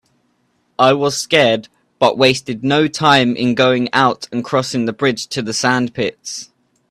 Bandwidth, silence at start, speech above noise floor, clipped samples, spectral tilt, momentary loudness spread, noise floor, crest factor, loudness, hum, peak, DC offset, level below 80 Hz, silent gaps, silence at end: 13.5 kHz; 0.8 s; 47 dB; under 0.1%; -4 dB/octave; 10 LU; -62 dBFS; 16 dB; -15 LUFS; none; 0 dBFS; under 0.1%; -56 dBFS; none; 0.45 s